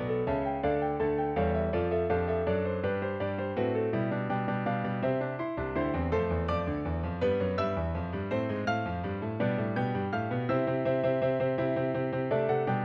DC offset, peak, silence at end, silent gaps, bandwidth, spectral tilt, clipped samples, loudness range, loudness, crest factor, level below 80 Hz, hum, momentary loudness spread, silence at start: under 0.1%; -16 dBFS; 0 s; none; 6.6 kHz; -9 dB/octave; under 0.1%; 2 LU; -30 LUFS; 14 dB; -48 dBFS; none; 4 LU; 0 s